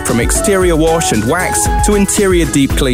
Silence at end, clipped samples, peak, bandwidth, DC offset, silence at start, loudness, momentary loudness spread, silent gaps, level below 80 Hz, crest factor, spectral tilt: 0 s; under 0.1%; 0 dBFS; 16.5 kHz; under 0.1%; 0 s; -12 LUFS; 2 LU; none; -20 dBFS; 12 dB; -4.5 dB/octave